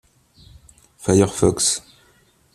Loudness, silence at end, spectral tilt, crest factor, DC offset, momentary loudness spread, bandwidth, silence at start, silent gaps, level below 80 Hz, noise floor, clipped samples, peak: -19 LUFS; 0.75 s; -4.5 dB/octave; 20 dB; under 0.1%; 10 LU; 14.5 kHz; 1 s; none; -46 dBFS; -57 dBFS; under 0.1%; -2 dBFS